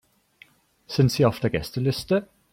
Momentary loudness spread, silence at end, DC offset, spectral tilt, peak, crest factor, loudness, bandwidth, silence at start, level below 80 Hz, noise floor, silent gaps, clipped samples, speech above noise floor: 7 LU; 0.3 s; under 0.1%; -6.5 dB/octave; -6 dBFS; 18 dB; -24 LUFS; 16 kHz; 0.9 s; -50 dBFS; -56 dBFS; none; under 0.1%; 34 dB